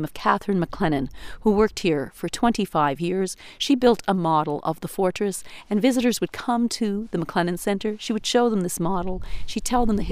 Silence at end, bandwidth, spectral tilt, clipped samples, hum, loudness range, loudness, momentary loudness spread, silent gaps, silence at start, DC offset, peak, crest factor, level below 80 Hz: 0 s; 15.5 kHz; -5 dB/octave; under 0.1%; none; 2 LU; -23 LUFS; 8 LU; none; 0 s; under 0.1%; -4 dBFS; 18 dB; -40 dBFS